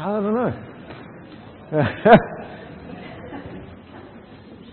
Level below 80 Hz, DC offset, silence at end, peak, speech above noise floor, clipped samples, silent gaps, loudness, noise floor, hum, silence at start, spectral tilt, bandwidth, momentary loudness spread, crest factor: -52 dBFS; under 0.1%; 0.2 s; 0 dBFS; 25 dB; under 0.1%; none; -18 LUFS; -42 dBFS; none; 0 s; -10 dB/octave; 4.4 kHz; 28 LU; 22 dB